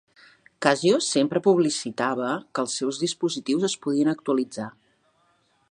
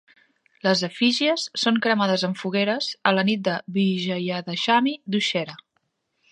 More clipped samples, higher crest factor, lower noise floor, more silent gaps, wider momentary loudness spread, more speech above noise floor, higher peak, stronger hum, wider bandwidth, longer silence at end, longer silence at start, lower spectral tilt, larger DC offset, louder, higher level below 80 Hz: neither; about the same, 22 dB vs 20 dB; second, -66 dBFS vs -73 dBFS; neither; about the same, 7 LU vs 6 LU; second, 42 dB vs 51 dB; about the same, -2 dBFS vs -2 dBFS; neither; about the same, 11 kHz vs 10.5 kHz; first, 1 s vs 0.75 s; about the same, 0.6 s vs 0.65 s; about the same, -4 dB/octave vs -4.5 dB/octave; neither; about the same, -24 LUFS vs -22 LUFS; about the same, -74 dBFS vs -74 dBFS